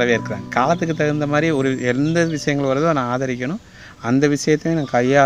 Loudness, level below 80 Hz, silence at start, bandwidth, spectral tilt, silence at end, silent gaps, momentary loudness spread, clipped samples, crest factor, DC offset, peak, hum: -19 LUFS; -48 dBFS; 0 s; 11.5 kHz; -6 dB/octave; 0 s; none; 6 LU; under 0.1%; 18 dB; under 0.1%; 0 dBFS; none